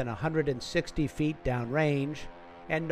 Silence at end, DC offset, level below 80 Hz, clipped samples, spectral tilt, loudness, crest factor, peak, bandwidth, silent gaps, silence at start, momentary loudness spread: 0 s; under 0.1%; -48 dBFS; under 0.1%; -6.5 dB/octave; -31 LUFS; 16 dB; -14 dBFS; 13.5 kHz; none; 0 s; 11 LU